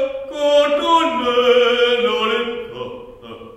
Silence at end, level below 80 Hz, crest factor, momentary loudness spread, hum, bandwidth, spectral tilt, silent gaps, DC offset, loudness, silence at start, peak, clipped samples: 0 s; -52 dBFS; 16 dB; 18 LU; none; 11 kHz; -3 dB/octave; none; under 0.1%; -16 LUFS; 0 s; -2 dBFS; under 0.1%